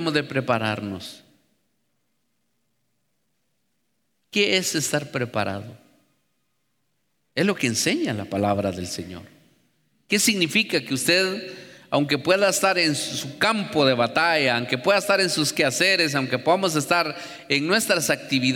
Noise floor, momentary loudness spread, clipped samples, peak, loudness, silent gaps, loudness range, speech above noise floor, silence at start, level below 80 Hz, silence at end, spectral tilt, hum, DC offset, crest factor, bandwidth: -74 dBFS; 12 LU; under 0.1%; -6 dBFS; -22 LUFS; none; 7 LU; 52 dB; 0 s; -66 dBFS; 0 s; -3.5 dB/octave; none; under 0.1%; 18 dB; 19 kHz